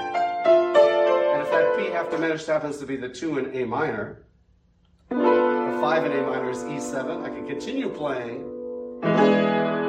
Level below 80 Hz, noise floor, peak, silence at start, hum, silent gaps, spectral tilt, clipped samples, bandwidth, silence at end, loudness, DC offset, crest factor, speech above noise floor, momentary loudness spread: -62 dBFS; -60 dBFS; -6 dBFS; 0 s; none; none; -6 dB/octave; under 0.1%; 10 kHz; 0 s; -23 LUFS; under 0.1%; 18 dB; 35 dB; 13 LU